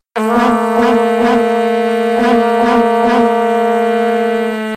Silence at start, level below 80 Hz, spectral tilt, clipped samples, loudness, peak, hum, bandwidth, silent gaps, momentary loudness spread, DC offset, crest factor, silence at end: 0.15 s; -48 dBFS; -5.5 dB/octave; under 0.1%; -12 LUFS; 0 dBFS; none; 14.5 kHz; none; 3 LU; under 0.1%; 12 dB; 0 s